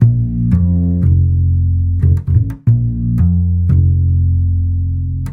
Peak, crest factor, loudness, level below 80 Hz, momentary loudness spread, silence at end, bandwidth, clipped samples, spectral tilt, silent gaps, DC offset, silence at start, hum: 0 dBFS; 12 dB; -14 LUFS; -22 dBFS; 4 LU; 0 s; 1.8 kHz; under 0.1%; -12 dB/octave; none; under 0.1%; 0 s; none